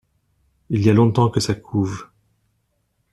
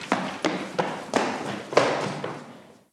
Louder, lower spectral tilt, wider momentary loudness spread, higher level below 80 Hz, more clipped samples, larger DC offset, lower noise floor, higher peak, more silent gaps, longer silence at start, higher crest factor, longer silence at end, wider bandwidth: first, -19 LUFS vs -27 LUFS; first, -7 dB/octave vs -4.5 dB/octave; about the same, 11 LU vs 12 LU; first, -50 dBFS vs -68 dBFS; neither; neither; first, -69 dBFS vs -47 dBFS; about the same, -2 dBFS vs -2 dBFS; neither; first, 0.7 s vs 0 s; second, 18 dB vs 26 dB; first, 1.1 s vs 0.2 s; second, 12.5 kHz vs 14 kHz